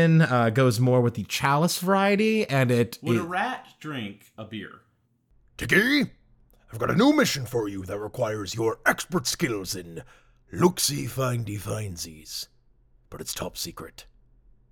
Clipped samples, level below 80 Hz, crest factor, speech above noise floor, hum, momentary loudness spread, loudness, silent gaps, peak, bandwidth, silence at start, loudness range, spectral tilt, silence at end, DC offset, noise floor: under 0.1%; -54 dBFS; 20 dB; 41 dB; none; 18 LU; -25 LUFS; none; -6 dBFS; 18.5 kHz; 0 s; 7 LU; -5 dB/octave; 0.7 s; under 0.1%; -66 dBFS